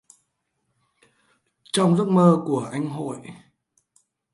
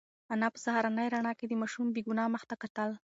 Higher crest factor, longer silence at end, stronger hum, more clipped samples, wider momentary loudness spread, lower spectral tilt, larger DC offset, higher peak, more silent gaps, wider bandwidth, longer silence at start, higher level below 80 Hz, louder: about the same, 20 dB vs 16 dB; first, 1 s vs 0.1 s; neither; neither; first, 17 LU vs 6 LU; first, -6.5 dB/octave vs -4.5 dB/octave; neither; first, -4 dBFS vs -16 dBFS; second, none vs 2.70-2.75 s; first, 11.5 kHz vs 8 kHz; first, 1.75 s vs 0.3 s; first, -70 dBFS vs -82 dBFS; first, -21 LUFS vs -34 LUFS